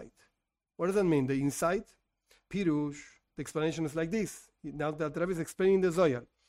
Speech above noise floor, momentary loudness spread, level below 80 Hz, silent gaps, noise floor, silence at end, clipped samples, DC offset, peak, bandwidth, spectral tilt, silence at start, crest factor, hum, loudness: 54 dB; 12 LU; -60 dBFS; none; -84 dBFS; 0.25 s; under 0.1%; under 0.1%; -16 dBFS; 16 kHz; -6 dB/octave; 0 s; 16 dB; none; -31 LUFS